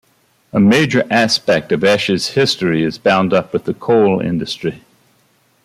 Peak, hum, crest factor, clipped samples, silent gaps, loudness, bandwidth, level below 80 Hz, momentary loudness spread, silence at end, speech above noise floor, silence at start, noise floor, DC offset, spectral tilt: -2 dBFS; none; 14 dB; under 0.1%; none; -15 LUFS; 14.5 kHz; -54 dBFS; 9 LU; 0.9 s; 42 dB; 0.55 s; -57 dBFS; under 0.1%; -5 dB/octave